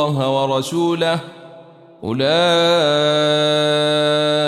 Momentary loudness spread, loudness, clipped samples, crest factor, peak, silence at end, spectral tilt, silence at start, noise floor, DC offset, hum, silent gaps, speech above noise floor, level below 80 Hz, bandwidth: 8 LU; -16 LUFS; under 0.1%; 12 dB; -6 dBFS; 0 s; -5 dB/octave; 0 s; -42 dBFS; under 0.1%; none; none; 26 dB; -62 dBFS; 14 kHz